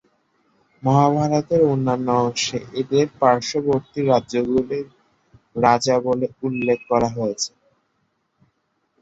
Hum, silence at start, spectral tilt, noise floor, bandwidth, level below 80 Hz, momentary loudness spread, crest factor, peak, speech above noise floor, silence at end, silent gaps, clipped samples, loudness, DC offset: none; 0.85 s; -5.5 dB/octave; -69 dBFS; 8 kHz; -56 dBFS; 9 LU; 20 dB; -2 dBFS; 50 dB; 1.55 s; none; under 0.1%; -20 LUFS; under 0.1%